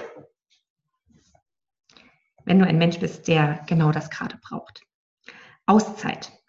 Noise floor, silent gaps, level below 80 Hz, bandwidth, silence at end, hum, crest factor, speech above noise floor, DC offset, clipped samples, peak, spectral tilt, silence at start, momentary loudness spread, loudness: -63 dBFS; 0.70-0.76 s, 4.94-5.17 s; -60 dBFS; 7.6 kHz; 0.2 s; none; 20 dB; 41 dB; under 0.1%; under 0.1%; -4 dBFS; -6.5 dB/octave; 0 s; 17 LU; -22 LUFS